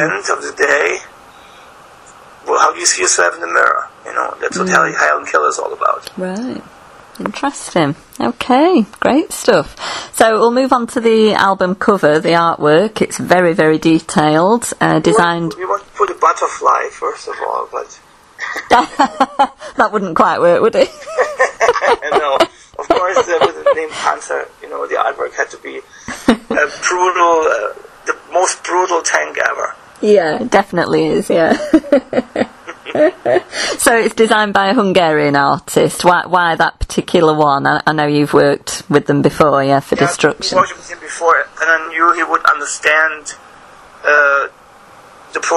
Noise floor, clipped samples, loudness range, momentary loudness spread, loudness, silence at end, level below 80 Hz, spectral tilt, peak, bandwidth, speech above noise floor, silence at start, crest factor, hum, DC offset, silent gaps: -41 dBFS; 0.1%; 4 LU; 11 LU; -13 LUFS; 0 s; -44 dBFS; -4 dB/octave; 0 dBFS; 14 kHz; 27 dB; 0 s; 14 dB; none; under 0.1%; none